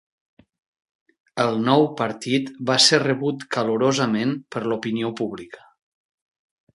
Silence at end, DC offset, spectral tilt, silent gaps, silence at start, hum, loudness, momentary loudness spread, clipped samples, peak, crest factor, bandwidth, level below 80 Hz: 1.2 s; under 0.1%; -4 dB/octave; none; 1.35 s; none; -21 LUFS; 13 LU; under 0.1%; -2 dBFS; 22 dB; 11.5 kHz; -66 dBFS